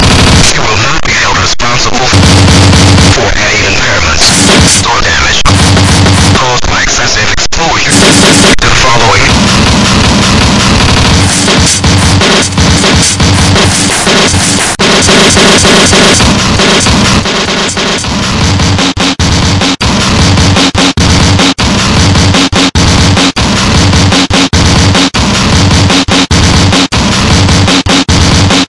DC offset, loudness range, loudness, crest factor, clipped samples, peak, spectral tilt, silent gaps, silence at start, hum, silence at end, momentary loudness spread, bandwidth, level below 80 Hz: under 0.1%; 2 LU; -5 LUFS; 6 dB; 2%; 0 dBFS; -3.5 dB/octave; none; 0 s; none; 0 s; 5 LU; 12 kHz; -18 dBFS